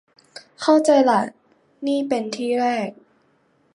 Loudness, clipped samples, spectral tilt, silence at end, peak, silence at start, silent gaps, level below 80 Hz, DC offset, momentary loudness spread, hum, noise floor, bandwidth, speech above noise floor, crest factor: -20 LUFS; under 0.1%; -4.5 dB/octave; 0.8 s; -4 dBFS; 0.35 s; none; -72 dBFS; under 0.1%; 14 LU; none; -62 dBFS; 11.5 kHz; 43 dB; 18 dB